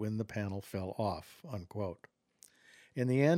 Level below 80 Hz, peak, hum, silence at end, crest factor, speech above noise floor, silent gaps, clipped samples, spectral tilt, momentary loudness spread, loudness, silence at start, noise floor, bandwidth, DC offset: -68 dBFS; -14 dBFS; none; 0 s; 22 dB; 31 dB; none; under 0.1%; -7.5 dB/octave; 12 LU; -38 LUFS; 0 s; -65 dBFS; 16.5 kHz; under 0.1%